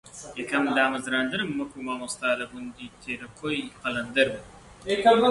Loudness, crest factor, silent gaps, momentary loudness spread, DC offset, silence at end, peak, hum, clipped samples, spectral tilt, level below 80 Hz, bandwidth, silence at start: -26 LUFS; 18 dB; none; 16 LU; under 0.1%; 0 s; -8 dBFS; none; under 0.1%; -4 dB/octave; -58 dBFS; 11.5 kHz; 0.05 s